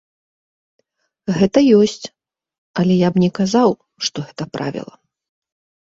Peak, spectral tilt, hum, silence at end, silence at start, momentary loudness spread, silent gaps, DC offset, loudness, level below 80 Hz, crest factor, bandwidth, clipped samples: -2 dBFS; -6 dB/octave; none; 1 s; 1.25 s; 18 LU; 2.58-2.74 s; under 0.1%; -17 LUFS; -56 dBFS; 18 dB; 7.8 kHz; under 0.1%